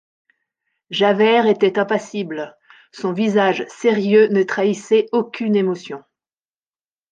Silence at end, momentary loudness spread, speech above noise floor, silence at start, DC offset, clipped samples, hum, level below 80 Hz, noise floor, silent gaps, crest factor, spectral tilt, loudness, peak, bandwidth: 1.15 s; 13 LU; over 73 dB; 0.9 s; under 0.1%; under 0.1%; none; -70 dBFS; under -90 dBFS; none; 16 dB; -5.5 dB/octave; -18 LUFS; -2 dBFS; 9 kHz